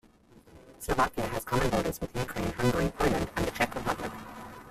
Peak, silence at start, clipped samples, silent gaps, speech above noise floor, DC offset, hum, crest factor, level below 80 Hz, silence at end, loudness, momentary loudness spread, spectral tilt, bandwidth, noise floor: -12 dBFS; 0.35 s; under 0.1%; none; 28 dB; under 0.1%; none; 18 dB; -44 dBFS; 0 s; -30 LUFS; 12 LU; -5 dB/octave; 16 kHz; -57 dBFS